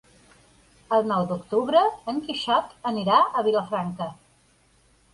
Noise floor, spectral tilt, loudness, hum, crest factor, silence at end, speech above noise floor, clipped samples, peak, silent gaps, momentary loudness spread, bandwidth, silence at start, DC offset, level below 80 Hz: -61 dBFS; -6 dB/octave; -24 LUFS; none; 20 dB; 1 s; 38 dB; under 0.1%; -6 dBFS; none; 10 LU; 11.5 kHz; 0.9 s; under 0.1%; -62 dBFS